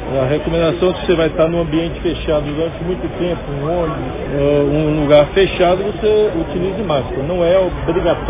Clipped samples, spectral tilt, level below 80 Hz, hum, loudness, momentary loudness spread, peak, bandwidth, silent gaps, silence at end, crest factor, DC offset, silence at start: under 0.1%; -11 dB/octave; -30 dBFS; none; -16 LUFS; 7 LU; 0 dBFS; 3.9 kHz; none; 0 s; 16 dB; under 0.1%; 0 s